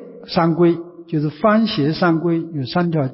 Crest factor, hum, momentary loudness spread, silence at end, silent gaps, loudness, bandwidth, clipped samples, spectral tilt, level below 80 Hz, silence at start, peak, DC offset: 14 dB; none; 7 LU; 0 s; none; -18 LUFS; 5.8 kHz; under 0.1%; -11 dB/octave; -54 dBFS; 0 s; -4 dBFS; under 0.1%